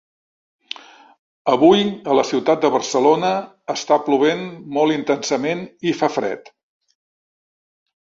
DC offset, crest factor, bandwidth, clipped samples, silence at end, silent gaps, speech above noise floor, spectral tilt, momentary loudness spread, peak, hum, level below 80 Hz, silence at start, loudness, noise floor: under 0.1%; 18 dB; 7.8 kHz; under 0.1%; 1.7 s; none; 20 dB; -4.5 dB/octave; 12 LU; -2 dBFS; none; -64 dBFS; 1.45 s; -18 LUFS; -37 dBFS